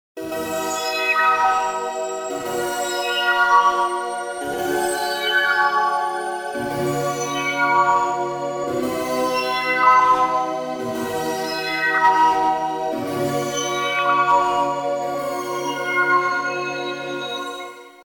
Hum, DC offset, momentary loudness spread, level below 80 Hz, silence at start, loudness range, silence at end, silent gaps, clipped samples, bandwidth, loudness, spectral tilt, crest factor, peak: none; under 0.1%; 11 LU; -60 dBFS; 0.15 s; 3 LU; 0.05 s; none; under 0.1%; over 20 kHz; -20 LUFS; -3 dB/octave; 18 dB; -4 dBFS